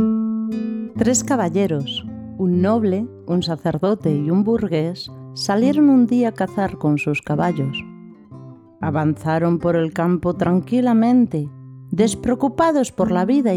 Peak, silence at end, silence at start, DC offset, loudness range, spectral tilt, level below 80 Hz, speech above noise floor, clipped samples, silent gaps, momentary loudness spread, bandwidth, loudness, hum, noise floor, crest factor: -4 dBFS; 0 s; 0 s; under 0.1%; 3 LU; -6 dB/octave; -50 dBFS; 22 dB; under 0.1%; none; 11 LU; 13.5 kHz; -19 LUFS; none; -40 dBFS; 14 dB